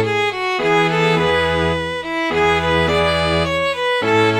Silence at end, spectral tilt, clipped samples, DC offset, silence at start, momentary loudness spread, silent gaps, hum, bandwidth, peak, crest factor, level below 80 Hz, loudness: 0 s; -5 dB/octave; under 0.1%; under 0.1%; 0 s; 4 LU; none; none; 15 kHz; -4 dBFS; 12 dB; -38 dBFS; -17 LUFS